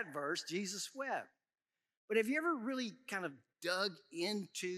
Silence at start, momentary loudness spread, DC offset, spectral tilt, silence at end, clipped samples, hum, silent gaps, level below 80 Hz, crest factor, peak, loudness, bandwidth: 0 s; 7 LU; under 0.1%; -3 dB/octave; 0 s; under 0.1%; none; 1.97-2.08 s; under -90 dBFS; 20 dB; -20 dBFS; -39 LUFS; 15.5 kHz